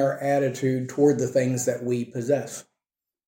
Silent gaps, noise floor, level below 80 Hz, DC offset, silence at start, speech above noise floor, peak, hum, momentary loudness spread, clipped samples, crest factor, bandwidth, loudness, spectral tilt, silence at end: none; -90 dBFS; -70 dBFS; under 0.1%; 0 s; 66 dB; -8 dBFS; none; 7 LU; under 0.1%; 16 dB; 16.5 kHz; -24 LUFS; -6 dB/octave; 0.65 s